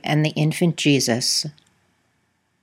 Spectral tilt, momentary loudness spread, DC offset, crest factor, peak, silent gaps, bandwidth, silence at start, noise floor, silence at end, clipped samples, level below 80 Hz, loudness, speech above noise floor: -4.5 dB/octave; 4 LU; under 0.1%; 18 dB; -4 dBFS; none; 16 kHz; 0.05 s; -68 dBFS; 1.1 s; under 0.1%; -70 dBFS; -19 LUFS; 48 dB